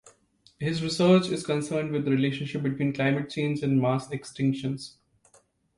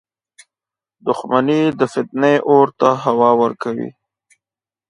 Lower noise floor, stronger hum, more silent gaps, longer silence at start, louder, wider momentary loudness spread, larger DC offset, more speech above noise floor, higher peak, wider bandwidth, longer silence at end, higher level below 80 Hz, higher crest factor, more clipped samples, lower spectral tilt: second, -63 dBFS vs under -90 dBFS; neither; neither; second, 0.6 s vs 1.05 s; second, -27 LUFS vs -16 LUFS; about the same, 11 LU vs 11 LU; neither; second, 37 dB vs over 75 dB; second, -10 dBFS vs 0 dBFS; about the same, 11.5 kHz vs 10.5 kHz; about the same, 0.9 s vs 1 s; about the same, -64 dBFS vs -64 dBFS; about the same, 18 dB vs 18 dB; neither; about the same, -6.5 dB/octave vs -6.5 dB/octave